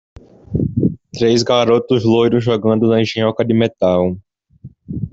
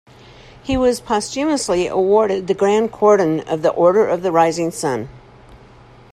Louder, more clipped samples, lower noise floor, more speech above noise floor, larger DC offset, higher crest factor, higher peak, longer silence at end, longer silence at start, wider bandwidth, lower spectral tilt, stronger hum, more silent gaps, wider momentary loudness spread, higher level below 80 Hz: about the same, -15 LUFS vs -17 LUFS; neither; about the same, -41 dBFS vs -44 dBFS; about the same, 27 dB vs 28 dB; neither; about the same, 14 dB vs 16 dB; about the same, -2 dBFS vs -2 dBFS; second, 0.05 s vs 0.6 s; second, 0.5 s vs 0.65 s; second, 8 kHz vs 13.5 kHz; first, -6.5 dB/octave vs -5 dB/octave; neither; neither; about the same, 8 LU vs 8 LU; about the same, -44 dBFS vs -46 dBFS